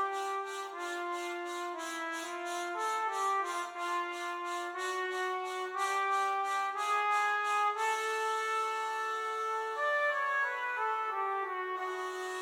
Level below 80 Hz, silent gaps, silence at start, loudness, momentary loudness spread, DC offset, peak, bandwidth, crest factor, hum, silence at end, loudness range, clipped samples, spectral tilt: under -90 dBFS; none; 0 s; -34 LUFS; 8 LU; under 0.1%; -20 dBFS; 18.5 kHz; 14 dB; none; 0 s; 4 LU; under 0.1%; 1 dB/octave